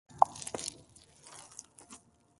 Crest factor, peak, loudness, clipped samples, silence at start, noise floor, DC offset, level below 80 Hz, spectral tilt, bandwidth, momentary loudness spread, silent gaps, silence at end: 32 dB; -4 dBFS; -33 LUFS; under 0.1%; 0.15 s; -59 dBFS; under 0.1%; -70 dBFS; -2 dB/octave; 12 kHz; 25 LU; none; 0.45 s